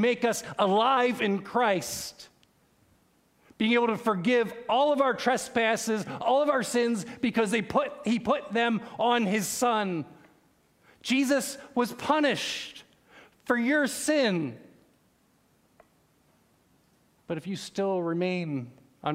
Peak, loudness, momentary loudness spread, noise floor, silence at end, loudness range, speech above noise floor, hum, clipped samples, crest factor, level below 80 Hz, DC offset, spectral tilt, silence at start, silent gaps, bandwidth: -10 dBFS; -27 LUFS; 11 LU; -66 dBFS; 0 s; 8 LU; 39 dB; none; under 0.1%; 20 dB; -70 dBFS; under 0.1%; -4 dB/octave; 0 s; none; 16 kHz